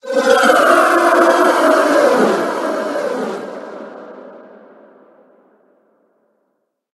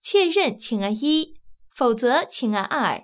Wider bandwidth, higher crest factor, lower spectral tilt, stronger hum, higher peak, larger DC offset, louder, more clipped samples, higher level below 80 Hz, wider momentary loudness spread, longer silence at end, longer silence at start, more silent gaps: first, 12.5 kHz vs 4 kHz; about the same, 16 dB vs 14 dB; second, -3.5 dB/octave vs -9 dB/octave; neither; first, 0 dBFS vs -8 dBFS; neither; first, -13 LUFS vs -22 LUFS; neither; about the same, -66 dBFS vs -66 dBFS; first, 21 LU vs 6 LU; first, 2.55 s vs 0.05 s; about the same, 0.05 s vs 0.05 s; neither